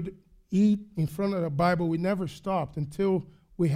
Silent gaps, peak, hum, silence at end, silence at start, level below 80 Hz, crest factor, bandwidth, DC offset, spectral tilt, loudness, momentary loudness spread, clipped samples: none; -12 dBFS; none; 0 s; 0 s; -56 dBFS; 16 dB; 15 kHz; under 0.1%; -8 dB/octave; -28 LUFS; 7 LU; under 0.1%